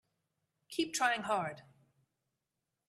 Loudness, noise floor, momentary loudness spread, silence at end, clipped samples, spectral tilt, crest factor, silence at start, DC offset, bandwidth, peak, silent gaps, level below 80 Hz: -35 LUFS; -88 dBFS; 11 LU; 1.3 s; under 0.1%; -2.5 dB/octave; 22 dB; 0.7 s; under 0.1%; 14 kHz; -16 dBFS; none; -82 dBFS